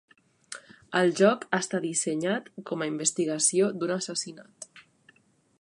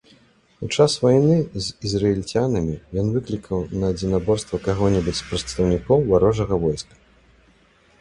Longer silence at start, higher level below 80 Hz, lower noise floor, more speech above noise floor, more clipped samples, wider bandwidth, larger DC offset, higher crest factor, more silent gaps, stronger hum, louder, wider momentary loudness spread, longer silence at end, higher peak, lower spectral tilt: about the same, 0.5 s vs 0.6 s; second, -78 dBFS vs -40 dBFS; first, -62 dBFS vs -56 dBFS; about the same, 35 dB vs 36 dB; neither; about the same, 11.5 kHz vs 11 kHz; neither; about the same, 22 dB vs 18 dB; neither; neither; second, -27 LUFS vs -21 LUFS; first, 20 LU vs 10 LU; second, 0.8 s vs 1.2 s; second, -6 dBFS vs -2 dBFS; second, -3.5 dB/octave vs -6 dB/octave